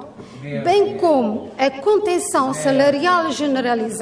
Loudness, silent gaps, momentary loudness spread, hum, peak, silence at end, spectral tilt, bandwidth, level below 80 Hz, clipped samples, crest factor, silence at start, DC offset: -18 LUFS; none; 8 LU; none; -4 dBFS; 0 s; -4 dB/octave; 11 kHz; -60 dBFS; under 0.1%; 14 dB; 0 s; under 0.1%